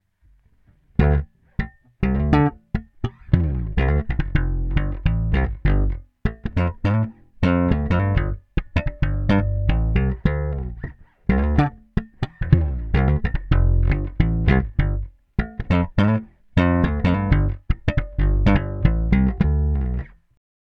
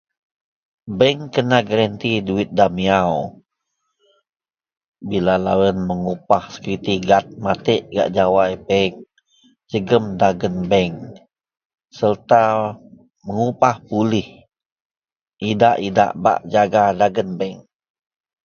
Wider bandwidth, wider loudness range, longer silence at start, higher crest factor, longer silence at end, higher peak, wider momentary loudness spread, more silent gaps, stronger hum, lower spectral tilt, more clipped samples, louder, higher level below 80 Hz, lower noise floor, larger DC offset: second, 6 kHz vs 7 kHz; about the same, 3 LU vs 3 LU; first, 1 s vs 0.85 s; about the same, 20 dB vs 20 dB; second, 0.7 s vs 0.85 s; about the same, 0 dBFS vs 0 dBFS; about the same, 10 LU vs 11 LU; second, none vs 4.88-4.92 s, 11.65-11.70 s, 14.66-14.76 s, 14.85-14.90 s, 15.21-15.26 s; neither; first, -9.5 dB/octave vs -6.5 dB/octave; neither; second, -22 LUFS vs -18 LUFS; first, -24 dBFS vs -50 dBFS; second, -57 dBFS vs -75 dBFS; neither